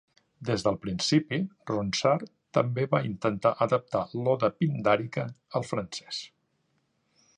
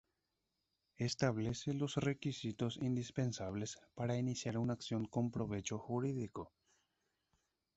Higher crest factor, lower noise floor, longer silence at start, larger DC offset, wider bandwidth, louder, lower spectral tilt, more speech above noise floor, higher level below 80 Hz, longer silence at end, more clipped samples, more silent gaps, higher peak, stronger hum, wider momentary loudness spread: about the same, 20 dB vs 20 dB; second, -73 dBFS vs -87 dBFS; second, 0.4 s vs 1 s; neither; first, 11 kHz vs 8 kHz; first, -28 LUFS vs -40 LUFS; about the same, -5.5 dB/octave vs -6.5 dB/octave; about the same, 46 dB vs 48 dB; first, -60 dBFS vs -66 dBFS; second, 1.1 s vs 1.3 s; neither; neither; first, -8 dBFS vs -20 dBFS; neither; about the same, 9 LU vs 7 LU